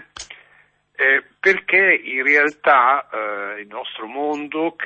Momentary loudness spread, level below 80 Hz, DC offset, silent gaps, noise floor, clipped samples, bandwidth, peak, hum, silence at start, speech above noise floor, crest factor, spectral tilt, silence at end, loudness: 16 LU; -66 dBFS; under 0.1%; none; -56 dBFS; under 0.1%; 8.6 kHz; -4 dBFS; none; 0.15 s; 37 dB; 16 dB; -3.5 dB/octave; 0 s; -17 LUFS